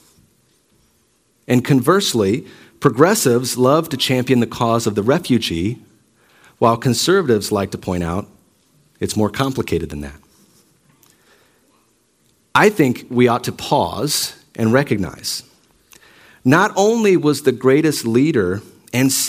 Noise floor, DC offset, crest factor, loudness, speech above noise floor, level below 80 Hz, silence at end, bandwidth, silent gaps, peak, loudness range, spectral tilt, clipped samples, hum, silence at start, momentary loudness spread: -60 dBFS; under 0.1%; 18 dB; -17 LUFS; 44 dB; -50 dBFS; 0 s; 16 kHz; none; 0 dBFS; 8 LU; -5 dB/octave; under 0.1%; none; 1.5 s; 10 LU